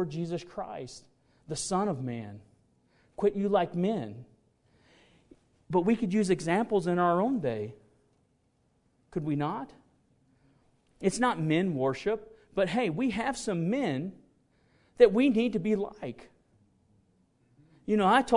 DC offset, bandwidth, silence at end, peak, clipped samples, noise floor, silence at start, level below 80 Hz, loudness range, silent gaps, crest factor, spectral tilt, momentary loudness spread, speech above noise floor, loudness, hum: under 0.1%; 11 kHz; 0 s; -6 dBFS; under 0.1%; -71 dBFS; 0 s; -62 dBFS; 6 LU; none; 24 dB; -6 dB/octave; 17 LU; 43 dB; -29 LUFS; none